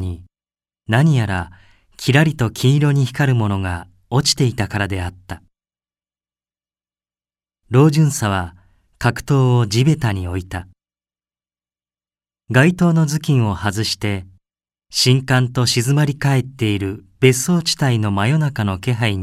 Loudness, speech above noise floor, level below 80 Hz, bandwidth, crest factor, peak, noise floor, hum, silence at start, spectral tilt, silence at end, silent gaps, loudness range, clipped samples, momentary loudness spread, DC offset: -17 LUFS; over 74 dB; -46 dBFS; 14.5 kHz; 18 dB; 0 dBFS; under -90 dBFS; none; 0 s; -5.5 dB/octave; 0 s; none; 5 LU; under 0.1%; 12 LU; under 0.1%